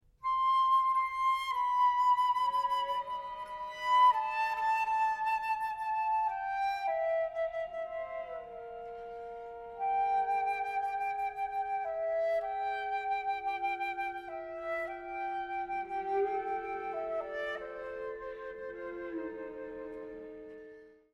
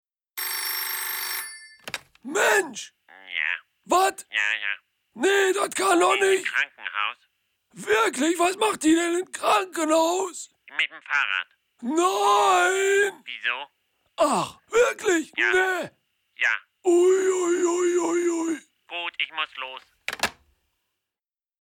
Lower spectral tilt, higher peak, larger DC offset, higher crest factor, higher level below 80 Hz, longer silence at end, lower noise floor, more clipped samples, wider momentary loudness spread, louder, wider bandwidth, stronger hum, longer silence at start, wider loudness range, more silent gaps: first, -3 dB/octave vs -1.5 dB/octave; second, -16 dBFS vs -8 dBFS; neither; about the same, 18 dB vs 16 dB; about the same, -66 dBFS vs -68 dBFS; second, 0.2 s vs 1.3 s; second, -54 dBFS vs under -90 dBFS; neither; about the same, 16 LU vs 15 LU; second, -33 LUFS vs -23 LUFS; second, 14.5 kHz vs 19.5 kHz; neither; second, 0.2 s vs 0.35 s; first, 9 LU vs 4 LU; neither